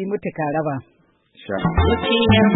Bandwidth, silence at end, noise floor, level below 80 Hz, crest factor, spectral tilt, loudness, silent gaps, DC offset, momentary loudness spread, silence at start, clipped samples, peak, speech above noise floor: 4.1 kHz; 0 s; -51 dBFS; -32 dBFS; 16 dB; -11.5 dB/octave; -20 LUFS; none; under 0.1%; 12 LU; 0 s; under 0.1%; -2 dBFS; 33 dB